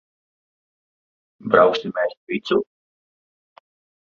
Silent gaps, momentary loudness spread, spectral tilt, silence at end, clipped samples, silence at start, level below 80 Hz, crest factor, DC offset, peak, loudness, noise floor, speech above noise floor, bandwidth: 2.17-2.27 s; 17 LU; -6 dB/octave; 1.5 s; under 0.1%; 1.45 s; -66 dBFS; 22 dB; under 0.1%; -2 dBFS; -20 LUFS; under -90 dBFS; over 71 dB; 7.2 kHz